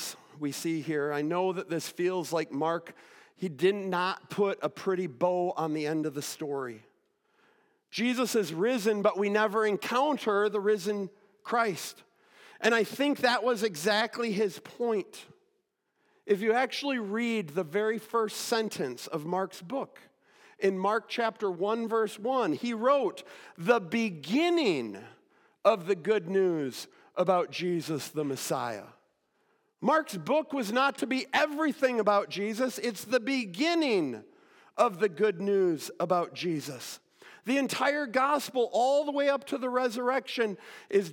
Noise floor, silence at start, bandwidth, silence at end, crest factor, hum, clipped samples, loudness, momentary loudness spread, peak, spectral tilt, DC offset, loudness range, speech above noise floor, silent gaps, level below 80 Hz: -77 dBFS; 0 s; 17.5 kHz; 0 s; 20 dB; none; under 0.1%; -29 LUFS; 10 LU; -10 dBFS; -4.5 dB/octave; under 0.1%; 4 LU; 48 dB; none; under -90 dBFS